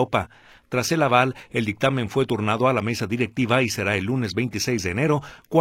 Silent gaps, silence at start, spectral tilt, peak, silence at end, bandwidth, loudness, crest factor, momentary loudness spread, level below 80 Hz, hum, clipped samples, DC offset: none; 0 s; -5 dB/octave; -2 dBFS; 0 s; 16.5 kHz; -23 LUFS; 20 dB; 7 LU; -54 dBFS; none; under 0.1%; under 0.1%